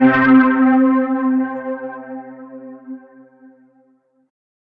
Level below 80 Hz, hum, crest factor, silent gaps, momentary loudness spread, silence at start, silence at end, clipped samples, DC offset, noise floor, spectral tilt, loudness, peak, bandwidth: -56 dBFS; none; 16 dB; none; 24 LU; 0 s; 1.75 s; under 0.1%; under 0.1%; -58 dBFS; -9 dB/octave; -15 LUFS; -2 dBFS; 4.4 kHz